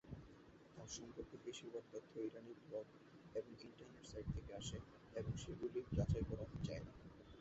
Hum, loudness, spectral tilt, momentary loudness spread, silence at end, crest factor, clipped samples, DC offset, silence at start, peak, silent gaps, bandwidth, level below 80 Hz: none; -50 LUFS; -7 dB/octave; 16 LU; 0 s; 20 dB; under 0.1%; under 0.1%; 0.05 s; -28 dBFS; none; 8 kHz; -58 dBFS